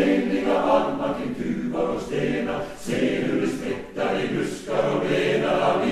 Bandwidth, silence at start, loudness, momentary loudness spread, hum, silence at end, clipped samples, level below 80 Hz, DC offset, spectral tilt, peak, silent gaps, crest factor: 13.5 kHz; 0 s; -24 LUFS; 7 LU; none; 0 s; under 0.1%; -48 dBFS; under 0.1%; -6 dB/octave; -6 dBFS; none; 18 dB